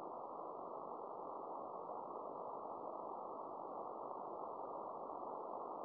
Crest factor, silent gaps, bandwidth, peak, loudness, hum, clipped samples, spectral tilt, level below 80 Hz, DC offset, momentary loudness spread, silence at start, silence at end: 16 dB; none; 4.9 kHz; -32 dBFS; -48 LUFS; none; under 0.1%; -8.5 dB/octave; under -90 dBFS; under 0.1%; 1 LU; 0 s; 0 s